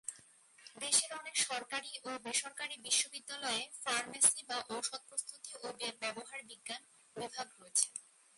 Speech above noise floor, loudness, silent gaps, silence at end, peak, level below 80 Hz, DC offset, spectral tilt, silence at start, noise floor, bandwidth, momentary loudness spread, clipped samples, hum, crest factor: 24 dB; -36 LUFS; none; 0.35 s; -12 dBFS; -86 dBFS; under 0.1%; 1 dB/octave; 0.05 s; -63 dBFS; 12 kHz; 16 LU; under 0.1%; none; 28 dB